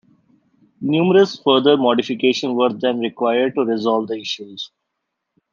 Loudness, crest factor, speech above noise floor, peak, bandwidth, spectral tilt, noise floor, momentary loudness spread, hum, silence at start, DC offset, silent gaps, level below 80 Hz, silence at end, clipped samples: -18 LUFS; 18 dB; 60 dB; -2 dBFS; 7.2 kHz; -5.5 dB/octave; -77 dBFS; 13 LU; none; 0.8 s; under 0.1%; none; -70 dBFS; 0.85 s; under 0.1%